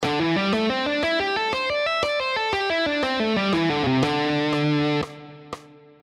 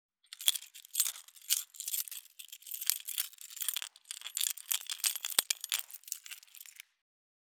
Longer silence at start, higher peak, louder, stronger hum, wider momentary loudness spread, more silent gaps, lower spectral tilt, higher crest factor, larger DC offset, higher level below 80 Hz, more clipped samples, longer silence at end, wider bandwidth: second, 0 s vs 0.3 s; second, -8 dBFS vs -2 dBFS; first, -22 LUFS vs -34 LUFS; neither; second, 9 LU vs 17 LU; neither; first, -5.5 dB/octave vs 4.5 dB/octave; second, 14 dB vs 38 dB; neither; first, -54 dBFS vs -88 dBFS; neither; second, 0.35 s vs 0.65 s; second, 12 kHz vs over 20 kHz